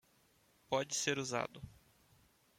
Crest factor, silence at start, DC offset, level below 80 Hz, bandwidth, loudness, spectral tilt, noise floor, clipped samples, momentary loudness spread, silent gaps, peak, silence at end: 24 dB; 0.7 s; under 0.1%; -72 dBFS; 16.5 kHz; -38 LUFS; -2.5 dB/octave; -72 dBFS; under 0.1%; 18 LU; none; -18 dBFS; 0.85 s